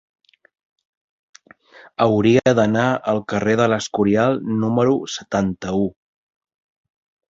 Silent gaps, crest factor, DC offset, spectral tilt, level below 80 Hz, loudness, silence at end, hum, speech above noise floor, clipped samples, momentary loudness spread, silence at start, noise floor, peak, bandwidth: none; 18 dB; under 0.1%; -6 dB/octave; -52 dBFS; -19 LUFS; 1.4 s; none; 30 dB; under 0.1%; 8 LU; 2 s; -48 dBFS; -2 dBFS; 7.8 kHz